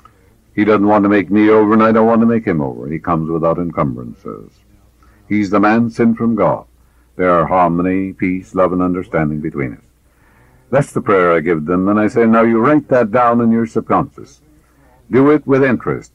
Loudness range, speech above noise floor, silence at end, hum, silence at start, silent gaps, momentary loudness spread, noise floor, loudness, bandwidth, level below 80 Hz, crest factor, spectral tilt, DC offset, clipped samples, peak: 5 LU; 38 dB; 0.1 s; none; 0.55 s; none; 10 LU; -51 dBFS; -14 LUFS; 11 kHz; -46 dBFS; 12 dB; -8.5 dB/octave; under 0.1%; under 0.1%; -2 dBFS